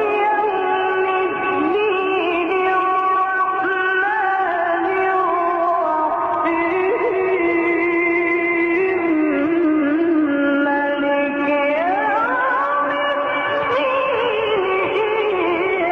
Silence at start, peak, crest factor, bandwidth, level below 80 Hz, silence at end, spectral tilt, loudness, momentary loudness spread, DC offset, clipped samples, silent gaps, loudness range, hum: 0 s; -8 dBFS; 10 dB; 6 kHz; -56 dBFS; 0 s; -6.5 dB/octave; -18 LUFS; 2 LU; under 0.1%; under 0.1%; none; 1 LU; none